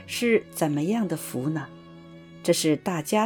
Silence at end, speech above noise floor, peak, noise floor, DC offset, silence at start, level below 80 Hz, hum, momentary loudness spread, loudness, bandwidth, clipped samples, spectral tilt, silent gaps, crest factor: 0 s; 21 dB; -8 dBFS; -46 dBFS; under 0.1%; 0 s; -66 dBFS; none; 23 LU; -26 LUFS; 19 kHz; under 0.1%; -5 dB/octave; none; 18 dB